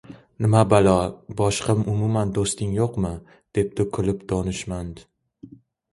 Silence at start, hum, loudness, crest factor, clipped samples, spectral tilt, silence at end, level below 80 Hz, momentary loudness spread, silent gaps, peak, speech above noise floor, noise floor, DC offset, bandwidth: 0.1 s; none; -23 LUFS; 20 dB; under 0.1%; -6 dB/octave; 0.45 s; -42 dBFS; 12 LU; none; -2 dBFS; 25 dB; -47 dBFS; under 0.1%; 11.5 kHz